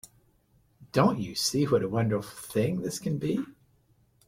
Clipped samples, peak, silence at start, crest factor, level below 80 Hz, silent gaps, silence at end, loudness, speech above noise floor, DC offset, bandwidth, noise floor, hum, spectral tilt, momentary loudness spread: under 0.1%; -8 dBFS; 0.8 s; 22 dB; -60 dBFS; none; 0.75 s; -28 LUFS; 38 dB; under 0.1%; 16.5 kHz; -66 dBFS; none; -5.5 dB/octave; 8 LU